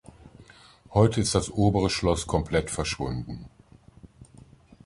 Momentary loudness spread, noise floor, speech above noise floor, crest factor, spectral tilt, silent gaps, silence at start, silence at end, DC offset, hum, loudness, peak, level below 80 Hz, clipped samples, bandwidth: 11 LU; -54 dBFS; 29 dB; 22 dB; -5.5 dB/octave; none; 0.25 s; 0.6 s; under 0.1%; none; -25 LUFS; -6 dBFS; -42 dBFS; under 0.1%; 11.5 kHz